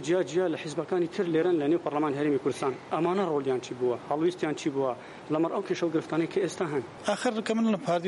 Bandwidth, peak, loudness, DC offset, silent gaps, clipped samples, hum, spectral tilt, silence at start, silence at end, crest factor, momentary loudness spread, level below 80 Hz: 11.5 kHz; -12 dBFS; -29 LUFS; under 0.1%; none; under 0.1%; none; -6 dB/octave; 0 s; 0 s; 16 dB; 5 LU; -72 dBFS